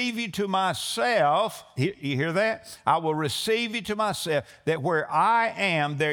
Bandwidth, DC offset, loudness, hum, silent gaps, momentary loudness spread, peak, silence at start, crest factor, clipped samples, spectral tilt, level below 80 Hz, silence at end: over 20 kHz; under 0.1%; -25 LUFS; none; none; 7 LU; -8 dBFS; 0 s; 18 dB; under 0.1%; -4.5 dB/octave; -66 dBFS; 0 s